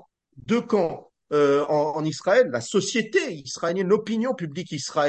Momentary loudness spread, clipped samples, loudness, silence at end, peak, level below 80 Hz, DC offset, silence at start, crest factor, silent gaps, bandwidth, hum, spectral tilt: 10 LU; under 0.1%; -24 LUFS; 0 s; -8 dBFS; -68 dBFS; under 0.1%; 0.35 s; 16 dB; none; 9 kHz; none; -4.5 dB/octave